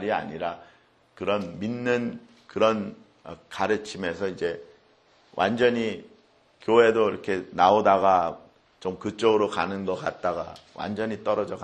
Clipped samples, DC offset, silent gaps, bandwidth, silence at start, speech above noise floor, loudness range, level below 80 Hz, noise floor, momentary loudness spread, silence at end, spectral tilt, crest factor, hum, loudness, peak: under 0.1%; under 0.1%; none; 9.6 kHz; 0 s; 35 dB; 7 LU; -64 dBFS; -60 dBFS; 19 LU; 0 s; -5.5 dB/octave; 22 dB; none; -25 LUFS; -4 dBFS